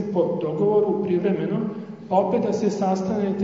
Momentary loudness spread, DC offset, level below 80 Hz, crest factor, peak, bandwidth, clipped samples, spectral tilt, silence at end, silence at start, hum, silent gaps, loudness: 5 LU; under 0.1%; -68 dBFS; 16 dB; -6 dBFS; 7.6 kHz; under 0.1%; -8 dB/octave; 0 s; 0 s; none; none; -23 LUFS